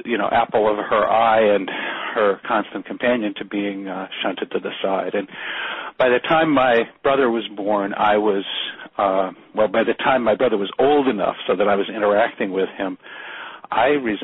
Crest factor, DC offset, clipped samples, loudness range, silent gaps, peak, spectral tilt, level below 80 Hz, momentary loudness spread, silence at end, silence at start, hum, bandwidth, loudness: 14 dB; under 0.1%; under 0.1%; 4 LU; none; -6 dBFS; -2.5 dB/octave; -56 dBFS; 10 LU; 0 s; 0.05 s; none; 4.1 kHz; -20 LUFS